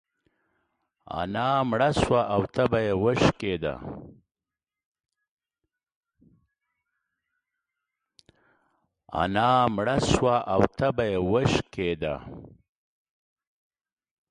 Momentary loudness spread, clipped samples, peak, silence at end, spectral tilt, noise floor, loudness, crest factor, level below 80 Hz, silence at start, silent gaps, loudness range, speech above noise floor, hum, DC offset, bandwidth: 12 LU; under 0.1%; -4 dBFS; 1.8 s; -6 dB/octave; under -90 dBFS; -25 LUFS; 24 dB; -48 dBFS; 1.1 s; 4.85-4.95 s, 5.28-5.38 s, 5.95-6.01 s; 8 LU; over 65 dB; none; under 0.1%; 11.5 kHz